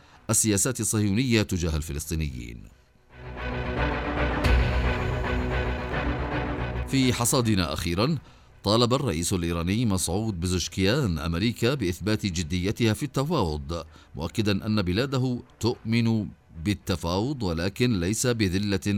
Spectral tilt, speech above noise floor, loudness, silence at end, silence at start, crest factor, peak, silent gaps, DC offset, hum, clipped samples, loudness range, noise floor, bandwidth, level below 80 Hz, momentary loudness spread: -4.5 dB/octave; 20 dB; -26 LUFS; 0 s; 0.3 s; 20 dB; -6 dBFS; none; under 0.1%; none; under 0.1%; 3 LU; -46 dBFS; 16.5 kHz; -36 dBFS; 9 LU